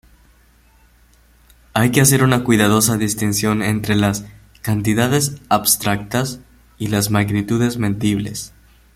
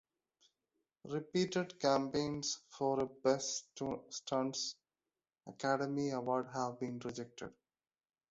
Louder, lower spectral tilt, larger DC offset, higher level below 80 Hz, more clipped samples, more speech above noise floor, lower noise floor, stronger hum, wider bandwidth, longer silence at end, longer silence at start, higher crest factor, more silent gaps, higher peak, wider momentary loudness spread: first, -17 LUFS vs -38 LUFS; about the same, -4.5 dB/octave vs -4 dB/octave; neither; first, -44 dBFS vs -74 dBFS; neither; second, 35 dB vs over 52 dB; second, -52 dBFS vs under -90 dBFS; neither; first, 16.5 kHz vs 8 kHz; second, 0.45 s vs 0.8 s; first, 1.75 s vs 1.05 s; about the same, 18 dB vs 20 dB; neither; first, 0 dBFS vs -18 dBFS; about the same, 13 LU vs 11 LU